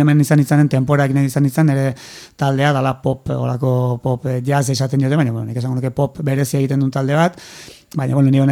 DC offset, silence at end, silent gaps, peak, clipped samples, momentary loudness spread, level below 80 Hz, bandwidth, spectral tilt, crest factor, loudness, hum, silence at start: under 0.1%; 0 s; none; -2 dBFS; under 0.1%; 9 LU; -50 dBFS; 15 kHz; -7 dB/octave; 14 dB; -17 LUFS; none; 0 s